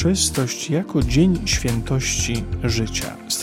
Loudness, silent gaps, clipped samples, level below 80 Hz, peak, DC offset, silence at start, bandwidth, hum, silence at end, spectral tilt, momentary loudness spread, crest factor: -21 LUFS; none; under 0.1%; -32 dBFS; -6 dBFS; under 0.1%; 0 s; 17 kHz; none; 0 s; -4 dB/octave; 6 LU; 16 dB